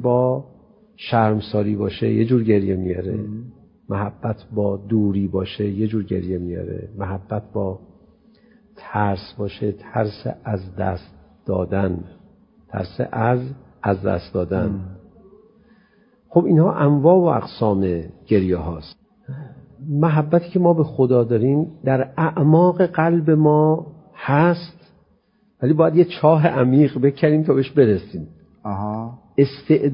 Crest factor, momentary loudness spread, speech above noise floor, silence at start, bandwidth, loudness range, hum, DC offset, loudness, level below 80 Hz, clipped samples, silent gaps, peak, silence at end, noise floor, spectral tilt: 18 dB; 15 LU; 42 dB; 0 s; 5.4 kHz; 9 LU; none; under 0.1%; -20 LUFS; -44 dBFS; under 0.1%; none; -2 dBFS; 0 s; -60 dBFS; -13 dB/octave